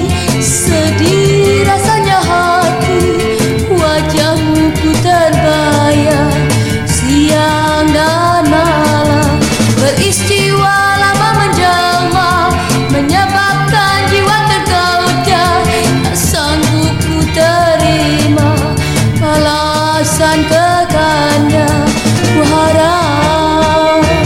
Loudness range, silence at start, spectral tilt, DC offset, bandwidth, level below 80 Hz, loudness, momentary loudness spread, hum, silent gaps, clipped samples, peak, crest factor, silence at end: 1 LU; 0 s; -4.5 dB/octave; under 0.1%; 16.5 kHz; -30 dBFS; -10 LUFS; 2 LU; none; none; under 0.1%; 0 dBFS; 10 dB; 0 s